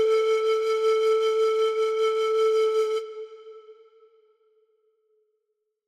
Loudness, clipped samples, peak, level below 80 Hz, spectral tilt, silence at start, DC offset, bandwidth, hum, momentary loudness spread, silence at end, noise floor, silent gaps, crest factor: -23 LUFS; under 0.1%; -14 dBFS; -84 dBFS; 0 dB/octave; 0 s; under 0.1%; 12 kHz; none; 9 LU; 2.15 s; -79 dBFS; none; 12 dB